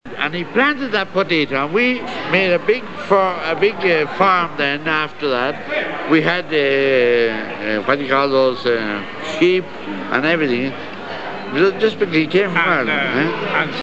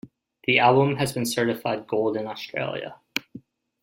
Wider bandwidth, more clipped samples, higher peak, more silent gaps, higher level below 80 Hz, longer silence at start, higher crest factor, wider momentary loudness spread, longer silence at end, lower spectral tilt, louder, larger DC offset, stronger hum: second, 8 kHz vs 16.5 kHz; neither; about the same, -2 dBFS vs -4 dBFS; neither; first, -58 dBFS vs -64 dBFS; about the same, 0 s vs 0.05 s; second, 16 dB vs 22 dB; second, 8 LU vs 14 LU; second, 0 s vs 0.45 s; about the same, -6 dB/octave vs -5 dB/octave; first, -17 LUFS vs -24 LUFS; first, 1% vs under 0.1%; neither